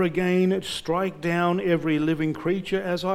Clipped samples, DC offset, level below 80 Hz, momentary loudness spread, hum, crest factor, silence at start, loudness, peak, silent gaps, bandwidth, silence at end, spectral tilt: under 0.1%; under 0.1%; -54 dBFS; 5 LU; none; 14 dB; 0 s; -24 LUFS; -10 dBFS; none; 15.5 kHz; 0 s; -6.5 dB/octave